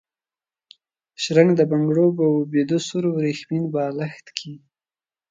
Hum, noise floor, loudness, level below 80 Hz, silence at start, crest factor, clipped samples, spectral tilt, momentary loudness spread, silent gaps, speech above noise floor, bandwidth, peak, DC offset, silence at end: none; under -90 dBFS; -20 LUFS; -70 dBFS; 1.2 s; 20 dB; under 0.1%; -6.5 dB/octave; 14 LU; none; over 70 dB; 9.2 kHz; -2 dBFS; under 0.1%; 0.75 s